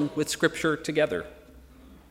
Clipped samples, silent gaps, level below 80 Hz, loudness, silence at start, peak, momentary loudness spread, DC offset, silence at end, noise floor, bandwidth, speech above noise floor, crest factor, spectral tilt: under 0.1%; none; -56 dBFS; -27 LUFS; 0 s; -8 dBFS; 8 LU; under 0.1%; 0.15 s; -51 dBFS; 16 kHz; 24 dB; 20 dB; -4 dB/octave